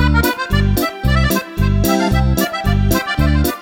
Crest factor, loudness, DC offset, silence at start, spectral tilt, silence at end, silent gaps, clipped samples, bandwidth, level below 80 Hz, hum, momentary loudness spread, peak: 14 dB; -16 LUFS; under 0.1%; 0 s; -5.5 dB/octave; 0 s; none; under 0.1%; 17.5 kHz; -20 dBFS; none; 3 LU; -2 dBFS